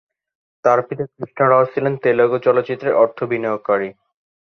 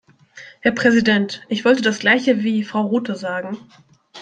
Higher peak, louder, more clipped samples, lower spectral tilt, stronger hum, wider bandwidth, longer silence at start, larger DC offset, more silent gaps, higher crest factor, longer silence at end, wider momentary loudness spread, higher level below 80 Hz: about the same, -2 dBFS vs -2 dBFS; about the same, -18 LUFS vs -18 LUFS; neither; first, -8 dB/octave vs -5 dB/octave; neither; second, 6.6 kHz vs 9.2 kHz; first, 0.65 s vs 0.35 s; neither; neither; about the same, 16 dB vs 18 dB; first, 0.6 s vs 0 s; about the same, 9 LU vs 10 LU; about the same, -64 dBFS vs -62 dBFS